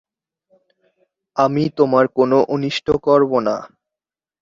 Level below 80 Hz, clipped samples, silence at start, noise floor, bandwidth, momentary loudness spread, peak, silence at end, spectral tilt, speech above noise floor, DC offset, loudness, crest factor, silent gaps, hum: -52 dBFS; under 0.1%; 1.35 s; -89 dBFS; 7.6 kHz; 7 LU; -2 dBFS; 0.75 s; -7 dB/octave; 73 dB; under 0.1%; -17 LUFS; 16 dB; none; none